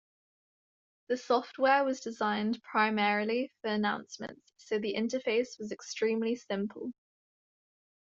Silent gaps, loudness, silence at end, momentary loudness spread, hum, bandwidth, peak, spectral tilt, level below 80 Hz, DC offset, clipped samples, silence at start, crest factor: none; -31 LUFS; 1.2 s; 12 LU; none; 7.8 kHz; -12 dBFS; -4.5 dB/octave; -78 dBFS; under 0.1%; under 0.1%; 1.1 s; 20 dB